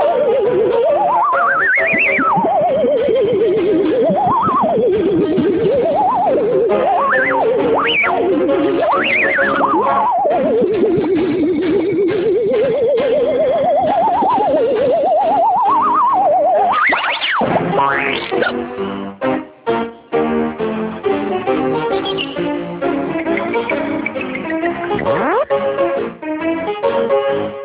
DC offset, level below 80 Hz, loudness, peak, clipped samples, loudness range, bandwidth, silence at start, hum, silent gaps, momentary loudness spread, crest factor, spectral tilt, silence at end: under 0.1%; -48 dBFS; -15 LUFS; -2 dBFS; under 0.1%; 5 LU; 4 kHz; 0 s; none; none; 7 LU; 12 dB; -9 dB/octave; 0 s